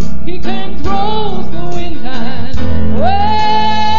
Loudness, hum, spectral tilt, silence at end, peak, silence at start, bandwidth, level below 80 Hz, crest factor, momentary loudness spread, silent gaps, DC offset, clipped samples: -17 LUFS; none; -6.5 dB/octave; 0 s; 0 dBFS; 0 s; 7.4 kHz; -28 dBFS; 12 dB; 10 LU; none; 60%; 0.5%